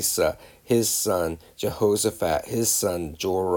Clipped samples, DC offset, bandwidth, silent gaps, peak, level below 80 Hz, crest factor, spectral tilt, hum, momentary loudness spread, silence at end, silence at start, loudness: under 0.1%; under 0.1%; over 20 kHz; none; -8 dBFS; -50 dBFS; 16 dB; -3.5 dB/octave; none; 9 LU; 0 s; 0 s; -24 LUFS